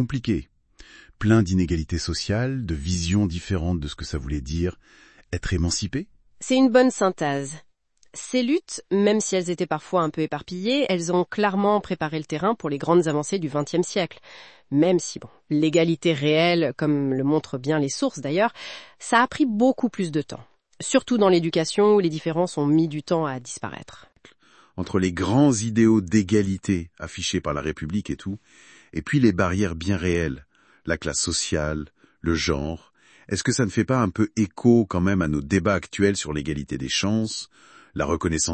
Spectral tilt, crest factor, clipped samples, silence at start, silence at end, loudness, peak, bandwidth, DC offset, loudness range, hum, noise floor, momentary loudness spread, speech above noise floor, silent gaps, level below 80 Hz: -5 dB/octave; 20 dB; under 0.1%; 0 s; 0 s; -23 LUFS; -4 dBFS; 8.8 kHz; under 0.1%; 4 LU; none; -57 dBFS; 13 LU; 34 dB; none; -44 dBFS